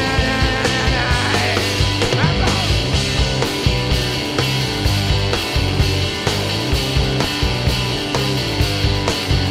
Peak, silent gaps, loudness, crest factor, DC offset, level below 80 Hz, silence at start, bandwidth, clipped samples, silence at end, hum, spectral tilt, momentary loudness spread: 0 dBFS; none; -17 LUFS; 16 dB; under 0.1%; -26 dBFS; 0 s; 16 kHz; under 0.1%; 0 s; none; -4.5 dB/octave; 2 LU